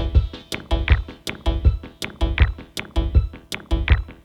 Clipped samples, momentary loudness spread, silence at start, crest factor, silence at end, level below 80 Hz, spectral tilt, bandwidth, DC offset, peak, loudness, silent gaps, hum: under 0.1%; 11 LU; 0 s; 20 dB; 0.1 s; -22 dBFS; -6 dB/octave; 13.5 kHz; under 0.1%; 0 dBFS; -23 LUFS; none; none